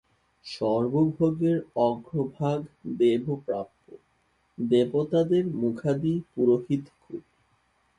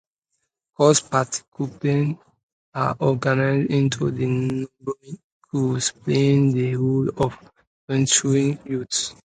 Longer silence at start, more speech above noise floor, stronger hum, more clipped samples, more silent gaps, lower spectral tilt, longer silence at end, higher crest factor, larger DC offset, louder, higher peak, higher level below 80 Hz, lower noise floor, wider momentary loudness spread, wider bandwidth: second, 0.45 s vs 0.8 s; second, 43 dB vs 56 dB; neither; neither; second, none vs 1.48-1.52 s, 2.43-2.72 s, 5.24-5.41 s, 7.67-7.88 s; first, -8.5 dB/octave vs -5 dB/octave; first, 0.8 s vs 0.25 s; about the same, 18 dB vs 20 dB; neither; second, -26 LUFS vs -22 LUFS; second, -10 dBFS vs -2 dBFS; second, -62 dBFS vs -56 dBFS; second, -69 dBFS vs -77 dBFS; first, 16 LU vs 13 LU; about the same, 10 kHz vs 9.6 kHz